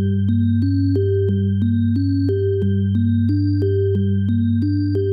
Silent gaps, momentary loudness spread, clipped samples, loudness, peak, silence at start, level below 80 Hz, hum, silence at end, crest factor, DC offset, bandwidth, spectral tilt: none; 1 LU; under 0.1%; -19 LUFS; -10 dBFS; 0 s; -54 dBFS; none; 0 s; 8 dB; under 0.1%; 5 kHz; -11.5 dB/octave